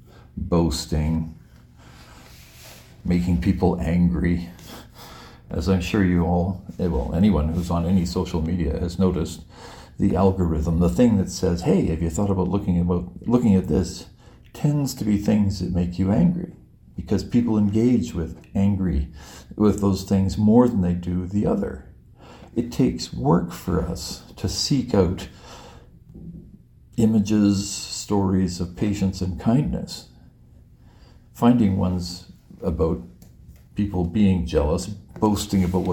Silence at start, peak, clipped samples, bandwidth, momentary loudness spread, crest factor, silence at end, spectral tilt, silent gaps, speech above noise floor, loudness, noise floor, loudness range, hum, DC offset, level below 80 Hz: 0.35 s; -4 dBFS; under 0.1%; 17 kHz; 16 LU; 18 dB; 0 s; -7 dB/octave; none; 29 dB; -22 LUFS; -50 dBFS; 4 LU; none; under 0.1%; -38 dBFS